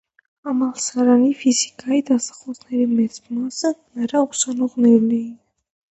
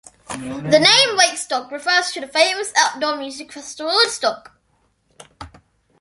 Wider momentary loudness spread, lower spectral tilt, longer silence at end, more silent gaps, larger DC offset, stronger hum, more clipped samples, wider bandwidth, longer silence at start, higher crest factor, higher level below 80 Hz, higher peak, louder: second, 11 LU vs 19 LU; first, -4 dB/octave vs -1.5 dB/octave; about the same, 0.6 s vs 0.55 s; neither; neither; neither; neither; second, 8.2 kHz vs 12 kHz; first, 0.45 s vs 0.3 s; about the same, 16 dB vs 20 dB; second, -68 dBFS vs -56 dBFS; about the same, -2 dBFS vs 0 dBFS; second, -19 LUFS vs -16 LUFS